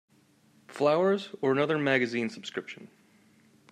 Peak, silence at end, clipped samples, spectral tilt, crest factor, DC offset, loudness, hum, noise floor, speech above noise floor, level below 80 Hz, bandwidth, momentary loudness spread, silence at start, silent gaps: -10 dBFS; 0.85 s; under 0.1%; -6 dB/octave; 20 dB; under 0.1%; -28 LUFS; none; -63 dBFS; 35 dB; -78 dBFS; 11 kHz; 18 LU; 0.7 s; none